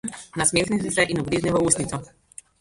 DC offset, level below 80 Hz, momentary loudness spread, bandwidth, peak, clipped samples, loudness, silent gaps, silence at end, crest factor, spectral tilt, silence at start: under 0.1%; -48 dBFS; 12 LU; 11.5 kHz; -4 dBFS; under 0.1%; -22 LUFS; none; 0.55 s; 20 dB; -3.5 dB/octave; 0.05 s